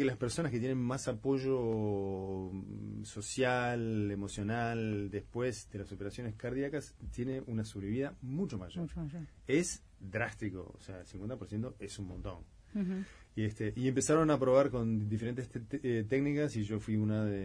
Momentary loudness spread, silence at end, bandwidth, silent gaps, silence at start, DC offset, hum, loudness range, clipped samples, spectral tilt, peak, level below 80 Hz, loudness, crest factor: 12 LU; 0 s; 11 kHz; none; 0 s; under 0.1%; none; 7 LU; under 0.1%; -6 dB/octave; -16 dBFS; -56 dBFS; -36 LUFS; 20 dB